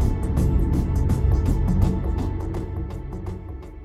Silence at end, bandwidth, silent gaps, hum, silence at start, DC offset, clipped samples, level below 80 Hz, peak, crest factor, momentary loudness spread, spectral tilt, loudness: 0 s; 13.5 kHz; none; none; 0 s; under 0.1%; under 0.1%; -24 dBFS; -8 dBFS; 14 dB; 12 LU; -8.5 dB/octave; -24 LUFS